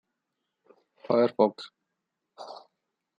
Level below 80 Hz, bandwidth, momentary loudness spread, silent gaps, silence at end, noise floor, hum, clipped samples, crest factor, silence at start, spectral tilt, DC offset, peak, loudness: -84 dBFS; 8.2 kHz; 23 LU; none; 0.65 s; -83 dBFS; none; under 0.1%; 24 dB; 1.1 s; -7.5 dB/octave; under 0.1%; -8 dBFS; -25 LUFS